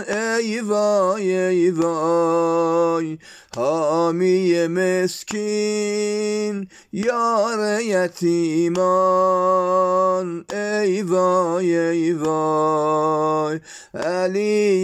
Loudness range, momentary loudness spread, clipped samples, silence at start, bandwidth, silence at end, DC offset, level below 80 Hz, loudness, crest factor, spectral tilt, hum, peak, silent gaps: 3 LU; 7 LU; under 0.1%; 0 s; 14.5 kHz; 0 s; under 0.1%; -66 dBFS; -20 LUFS; 12 dB; -5.5 dB/octave; none; -8 dBFS; none